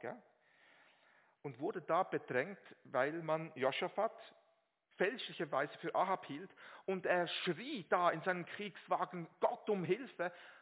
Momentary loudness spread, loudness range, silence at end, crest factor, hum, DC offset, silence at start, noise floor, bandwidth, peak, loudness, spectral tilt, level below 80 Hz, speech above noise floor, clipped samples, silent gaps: 13 LU; 3 LU; 0.05 s; 22 dB; none; under 0.1%; 0 s; -78 dBFS; 4 kHz; -18 dBFS; -39 LUFS; -3 dB/octave; under -90 dBFS; 39 dB; under 0.1%; none